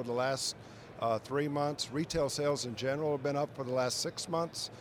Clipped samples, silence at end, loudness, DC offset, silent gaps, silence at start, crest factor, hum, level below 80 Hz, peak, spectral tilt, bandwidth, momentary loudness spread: under 0.1%; 0 s; -34 LUFS; under 0.1%; none; 0 s; 14 dB; none; -62 dBFS; -20 dBFS; -4 dB/octave; over 20 kHz; 5 LU